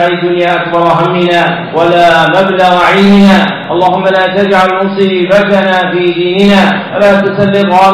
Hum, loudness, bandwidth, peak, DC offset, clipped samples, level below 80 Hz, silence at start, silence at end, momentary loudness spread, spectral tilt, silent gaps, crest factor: none; -7 LUFS; 12 kHz; 0 dBFS; under 0.1%; under 0.1%; -42 dBFS; 0 s; 0 s; 5 LU; -6.5 dB/octave; none; 8 dB